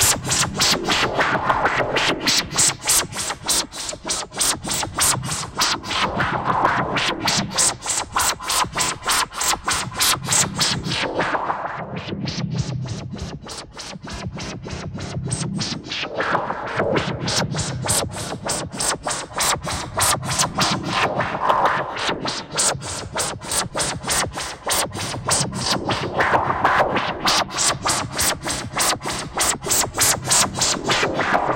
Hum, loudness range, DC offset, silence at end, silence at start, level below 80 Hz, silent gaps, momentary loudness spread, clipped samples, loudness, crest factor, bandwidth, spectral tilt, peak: none; 7 LU; under 0.1%; 0 s; 0 s; -44 dBFS; none; 10 LU; under 0.1%; -20 LUFS; 18 dB; 17 kHz; -2 dB/octave; -4 dBFS